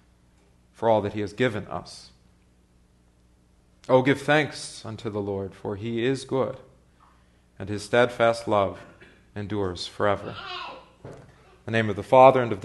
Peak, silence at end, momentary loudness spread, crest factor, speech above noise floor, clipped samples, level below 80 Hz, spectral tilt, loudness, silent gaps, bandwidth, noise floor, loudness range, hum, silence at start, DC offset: -2 dBFS; 0 s; 23 LU; 24 dB; 36 dB; under 0.1%; -58 dBFS; -6 dB/octave; -24 LUFS; none; 12 kHz; -60 dBFS; 5 LU; 60 Hz at -60 dBFS; 0.8 s; under 0.1%